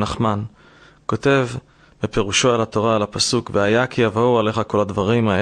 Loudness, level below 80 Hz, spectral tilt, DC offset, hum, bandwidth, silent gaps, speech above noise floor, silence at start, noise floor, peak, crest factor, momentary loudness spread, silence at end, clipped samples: -19 LUFS; -44 dBFS; -4.5 dB/octave; under 0.1%; none; 10.5 kHz; none; 30 dB; 0 s; -49 dBFS; -4 dBFS; 16 dB; 10 LU; 0 s; under 0.1%